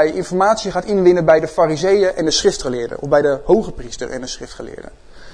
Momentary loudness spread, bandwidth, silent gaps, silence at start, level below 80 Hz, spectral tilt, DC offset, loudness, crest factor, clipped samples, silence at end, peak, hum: 15 LU; 10.5 kHz; none; 0 s; -40 dBFS; -4.5 dB/octave; under 0.1%; -16 LUFS; 16 dB; under 0.1%; 0 s; 0 dBFS; none